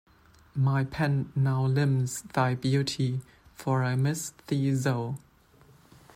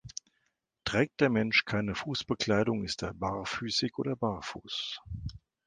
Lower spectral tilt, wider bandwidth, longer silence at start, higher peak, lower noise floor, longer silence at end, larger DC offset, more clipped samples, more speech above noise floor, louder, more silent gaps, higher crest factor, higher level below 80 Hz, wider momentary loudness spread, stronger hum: first, -6 dB/octave vs -4.5 dB/octave; first, 15 kHz vs 9.8 kHz; first, 0.55 s vs 0.05 s; about the same, -12 dBFS vs -12 dBFS; second, -58 dBFS vs -79 dBFS; first, 1 s vs 0.3 s; neither; neither; second, 31 dB vs 47 dB; first, -28 LUFS vs -31 LUFS; neither; second, 16 dB vs 22 dB; second, -60 dBFS vs -54 dBFS; second, 9 LU vs 13 LU; neither